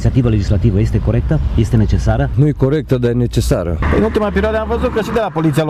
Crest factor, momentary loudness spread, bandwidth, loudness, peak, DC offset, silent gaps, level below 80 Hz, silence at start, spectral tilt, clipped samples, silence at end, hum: 12 dB; 3 LU; 14 kHz; -15 LUFS; -2 dBFS; under 0.1%; none; -22 dBFS; 0 s; -7.5 dB/octave; under 0.1%; 0 s; none